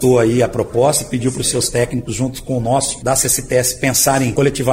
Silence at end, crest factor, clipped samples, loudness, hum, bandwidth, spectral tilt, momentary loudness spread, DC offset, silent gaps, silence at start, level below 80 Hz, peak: 0 s; 14 dB; under 0.1%; -16 LUFS; none; 16.5 kHz; -4 dB/octave; 7 LU; under 0.1%; none; 0 s; -38 dBFS; -2 dBFS